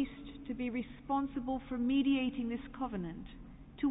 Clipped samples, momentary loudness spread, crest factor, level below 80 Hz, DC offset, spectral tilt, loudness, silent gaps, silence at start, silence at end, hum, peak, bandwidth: under 0.1%; 17 LU; 14 dB; -56 dBFS; under 0.1%; -4 dB/octave; -36 LUFS; none; 0 s; 0 s; none; -22 dBFS; 3.9 kHz